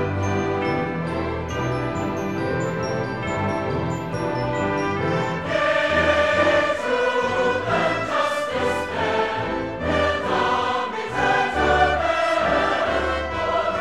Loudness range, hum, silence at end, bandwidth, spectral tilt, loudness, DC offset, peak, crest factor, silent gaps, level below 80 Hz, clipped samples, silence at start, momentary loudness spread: 5 LU; none; 0 s; 13 kHz; -5.5 dB/octave; -22 LUFS; 0.3%; -6 dBFS; 16 dB; none; -42 dBFS; under 0.1%; 0 s; 7 LU